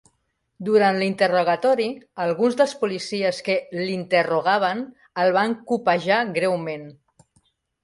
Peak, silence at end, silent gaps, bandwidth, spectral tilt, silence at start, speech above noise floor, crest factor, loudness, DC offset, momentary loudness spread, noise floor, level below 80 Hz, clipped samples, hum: -4 dBFS; 0.9 s; none; 11.5 kHz; -5 dB/octave; 0.6 s; 51 dB; 18 dB; -22 LUFS; under 0.1%; 8 LU; -72 dBFS; -68 dBFS; under 0.1%; none